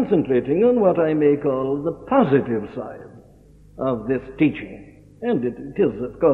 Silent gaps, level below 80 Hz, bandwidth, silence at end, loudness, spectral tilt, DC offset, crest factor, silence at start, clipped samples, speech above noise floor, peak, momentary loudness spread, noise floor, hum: none; -50 dBFS; 4.2 kHz; 0 s; -21 LUFS; -10 dB/octave; under 0.1%; 16 dB; 0 s; under 0.1%; 29 dB; -4 dBFS; 14 LU; -49 dBFS; none